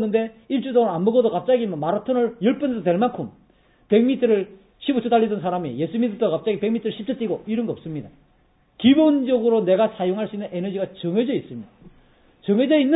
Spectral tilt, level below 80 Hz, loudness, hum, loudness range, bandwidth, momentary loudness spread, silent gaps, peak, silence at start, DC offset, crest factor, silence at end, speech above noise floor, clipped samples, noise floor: -11.5 dB/octave; -62 dBFS; -21 LUFS; none; 3 LU; 4 kHz; 10 LU; none; -4 dBFS; 0 s; under 0.1%; 18 dB; 0 s; 39 dB; under 0.1%; -60 dBFS